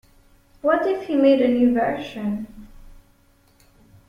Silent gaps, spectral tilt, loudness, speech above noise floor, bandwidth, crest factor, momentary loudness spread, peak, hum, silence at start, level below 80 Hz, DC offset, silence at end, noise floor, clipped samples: none; -7 dB/octave; -20 LUFS; 38 dB; 7 kHz; 18 dB; 11 LU; -6 dBFS; none; 0.65 s; -50 dBFS; under 0.1%; 1.15 s; -57 dBFS; under 0.1%